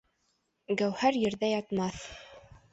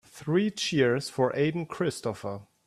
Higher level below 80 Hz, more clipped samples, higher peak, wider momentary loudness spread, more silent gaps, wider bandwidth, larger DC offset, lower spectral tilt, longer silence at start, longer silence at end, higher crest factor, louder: about the same, -62 dBFS vs -66 dBFS; neither; about the same, -12 dBFS vs -12 dBFS; first, 17 LU vs 9 LU; neither; second, 8.2 kHz vs 14 kHz; neither; about the same, -5 dB/octave vs -5.5 dB/octave; first, 0.7 s vs 0.15 s; about the same, 0.35 s vs 0.25 s; about the same, 20 dB vs 16 dB; about the same, -30 LUFS vs -28 LUFS